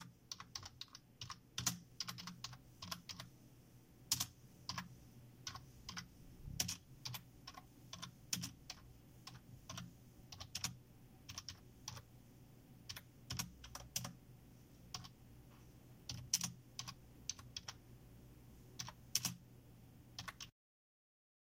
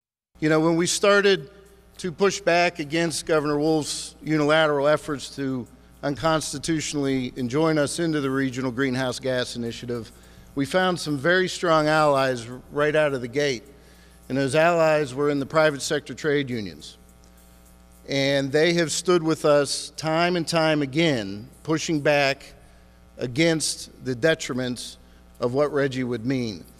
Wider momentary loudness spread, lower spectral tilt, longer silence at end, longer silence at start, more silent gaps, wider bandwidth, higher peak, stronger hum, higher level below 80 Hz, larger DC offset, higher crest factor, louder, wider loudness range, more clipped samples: first, 21 LU vs 12 LU; second, -1.5 dB/octave vs -4.5 dB/octave; first, 1 s vs 0.15 s; second, 0 s vs 0.4 s; neither; about the same, 16 kHz vs 15 kHz; second, -16 dBFS vs -6 dBFS; neither; second, -68 dBFS vs -52 dBFS; neither; first, 34 dB vs 18 dB; second, -47 LUFS vs -23 LUFS; about the same, 6 LU vs 4 LU; neither